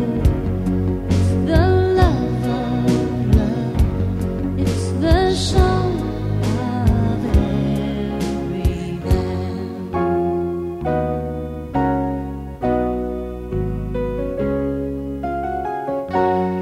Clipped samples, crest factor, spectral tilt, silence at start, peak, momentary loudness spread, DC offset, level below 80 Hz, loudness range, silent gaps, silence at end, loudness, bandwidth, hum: under 0.1%; 18 dB; -7.5 dB/octave; 0 s; -2 dBFS; 8 LU; under 0.1%; -26 dBFS; 5 LU; none; 0 s; -20 LUFS; 14.5 kHz; none